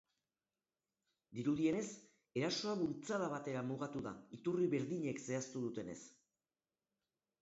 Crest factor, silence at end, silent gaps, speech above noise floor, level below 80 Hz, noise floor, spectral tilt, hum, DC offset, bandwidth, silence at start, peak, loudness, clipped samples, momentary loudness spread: 18 dB; 1.3 s; none; over 50 dB; -78 dBFS; under -90 dBFS; -5.5 dB/octave; none; under 0.1%; 8 kHz; 1.3 s; -24 dBFS; -41 LUFS; under 0.1%; 12 LU